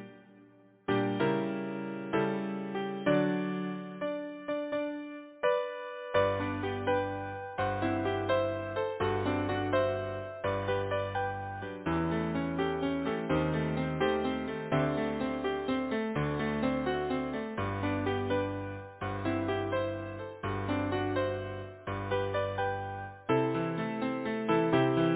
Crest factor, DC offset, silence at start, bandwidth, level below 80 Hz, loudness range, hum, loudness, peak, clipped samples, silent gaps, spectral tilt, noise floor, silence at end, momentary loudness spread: 18 dB; under 0.1%; 0 s; 4 kHz; -52 dBFS; 2 LU; none; -32 LUFS; -14 dBFS; under 0.1%; none; -5.5 dB/octave; -59 dBFS; 0 s; 9 LU